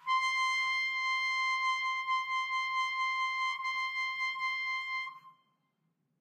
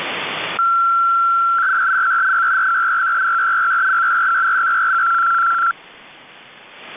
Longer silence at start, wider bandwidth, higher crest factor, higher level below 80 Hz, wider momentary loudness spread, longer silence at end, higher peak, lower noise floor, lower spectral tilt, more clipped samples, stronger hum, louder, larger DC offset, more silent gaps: about the same, 0 s vs 0 s; first, 13.5 kHz vs 3.9 kHz; first, 12 dB vs 6 dB; second, under -90 dBFS vs -68 dBFS; about the same, 4 LU vs 4 LU; first, 0.9 s vs 0 s; second, -22 dBFS vs -12 dBFS; first, -79 dBFS vs -42 dBFS; second, 3.5 dB/octave vs -4 dB/octave; neither; neither; second, -31 LUFS vs -15 LUFS; neither; neither